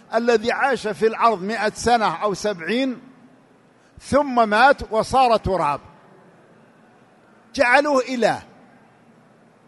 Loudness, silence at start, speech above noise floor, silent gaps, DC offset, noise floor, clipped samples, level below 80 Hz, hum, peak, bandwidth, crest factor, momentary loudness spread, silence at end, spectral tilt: -19 LUFS; 0.1 s; 35 dB; none; under 0.1%; -54 dBFS; under 0.1%; -48 dBFS; none; 0 dBFS; 11.5 kHz; 22 dB; 8 LU; 1.25 s; -4.5 dB/octave